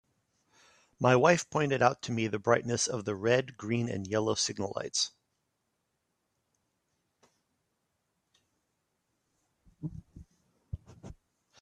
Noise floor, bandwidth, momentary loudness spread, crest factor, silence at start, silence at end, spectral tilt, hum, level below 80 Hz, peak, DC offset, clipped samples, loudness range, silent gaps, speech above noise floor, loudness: -81 dBFS; 11 kHz; 19 LU; 26 dB; 1 s; 0.5 s; -4 dB/octave; none; -62 dBFS; -8 dBFS; under 0.1%; under 0.1%; 24 LU; none; 52 dB; -29 LUFS